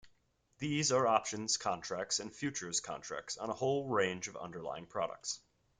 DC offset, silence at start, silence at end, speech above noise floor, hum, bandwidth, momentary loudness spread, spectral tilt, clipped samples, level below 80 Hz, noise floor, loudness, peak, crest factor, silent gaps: under 0.1%; 0.05 s; 0.4 s; 37 dB; none; 10 kHz; 12 LU; -3 dB/octave; under 0.1%; -74 dBFS; -74 dBFS; -36 LUFS; -14 dBFS; 22 dB; none